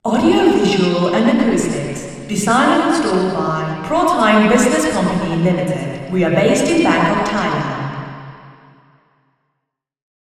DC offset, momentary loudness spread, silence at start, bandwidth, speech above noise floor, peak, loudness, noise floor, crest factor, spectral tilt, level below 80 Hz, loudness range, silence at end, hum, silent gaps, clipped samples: under 0.1%; 11 LU; 0.05 s; 14 kHz; 61 dB; 0 dBFS; -15 LUFS; -76 dBFS; 16 dB; -5.5 dB/octave; -46 dBFS; 5 LU; 1.8 s; none; none; under 0.1%